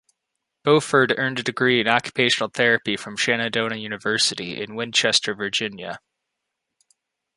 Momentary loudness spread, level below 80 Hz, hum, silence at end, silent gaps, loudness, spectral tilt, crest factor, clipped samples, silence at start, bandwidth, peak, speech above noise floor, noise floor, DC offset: 11 LU; -66 dBFS; none; 1.4 s; none; -21 LUFS; -3 dB/octave; 22 dB; under 0.1%; 0.65 s; 11.5 kHz; -2 dBFS; 59 dB; -81 dBFS; under 0.1%